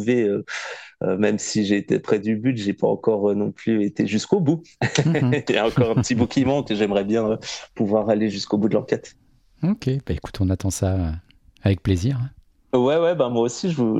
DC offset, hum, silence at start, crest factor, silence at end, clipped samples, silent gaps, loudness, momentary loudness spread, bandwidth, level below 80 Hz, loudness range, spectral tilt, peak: under 0.1%; none; 0 s; 16 dB; 0 s; under 0.1%; none; -22 LUFS; 7 LU; 13.5 kHz; -46 dBFS; 4 LU; -6 dB/octave; -4 dBFS